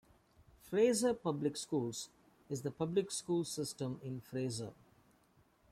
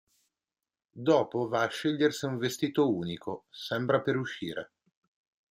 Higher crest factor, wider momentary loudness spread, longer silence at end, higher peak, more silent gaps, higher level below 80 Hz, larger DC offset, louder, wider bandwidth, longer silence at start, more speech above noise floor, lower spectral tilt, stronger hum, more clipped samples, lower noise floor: about the same, 18 dB vs 20 dB; about the same, 13 LU vs 12 LU; first, 1 s vs 0.85 s; second, -20 dBFS vs -12 dBFS; neither; about the same, -74 dBFS vs -72 dBFS; neither; second, -37 LUFS vs -30 LUFS; about the same, 15.5 kHz vs 16 kHz; second, 0.65 s vs 0.95 s; second, 34 dB vs over 61 dB; about the same, -5 dB/octave vs -5.5 dB/octave; neither; neither; second, -70 dBFS vs under -90 dBFS